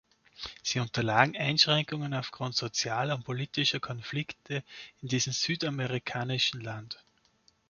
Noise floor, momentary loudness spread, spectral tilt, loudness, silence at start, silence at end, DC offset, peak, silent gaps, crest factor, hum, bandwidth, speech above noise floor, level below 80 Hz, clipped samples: -68 dBFS; 15 LU; -3.5 dB/octave; -30 LUFS; 0.4 s; 0.75 s; under 0.1%; -6 dBFS; none; 26 dB; none; 7.2 kHz; 37 dB; -66 dBFS; under 0.1%